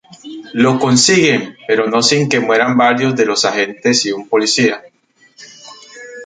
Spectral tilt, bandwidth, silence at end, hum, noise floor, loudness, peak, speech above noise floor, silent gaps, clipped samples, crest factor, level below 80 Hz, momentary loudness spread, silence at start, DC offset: -3.5 dB/octave; 9.4 kHz; 0 s; none; -49 dBFS; -13 LUFS; 0 dBFS; 36 dB; none; under 0.1%; 14 dB; -58 dBFS; 15 LU; 0.25 s; under 0.1%